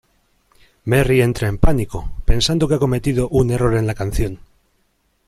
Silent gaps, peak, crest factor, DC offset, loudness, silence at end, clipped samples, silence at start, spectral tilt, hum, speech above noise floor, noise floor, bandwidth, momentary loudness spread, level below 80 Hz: none; 0 dBFS; 16 dB; under 0.1%; -18 LUFS; 0.9 s; under 0.1%; 0.85 s; -6 dB/octave; none; 48 dB; -64 dBFS; 14.5 kHz; 10 LU; -26 dBFS